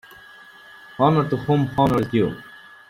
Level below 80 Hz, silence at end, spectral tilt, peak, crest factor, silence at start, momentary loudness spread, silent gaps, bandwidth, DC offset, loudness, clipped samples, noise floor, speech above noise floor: -50 dBFS; 0.35 s; -8.5 dB/octave; -4 dBFS; 18 dB; 1 s; 11 LU; none; 15 kHz; under 0.1%; -20 LUFS; under 0.1%; -45 dBFS; 26 dB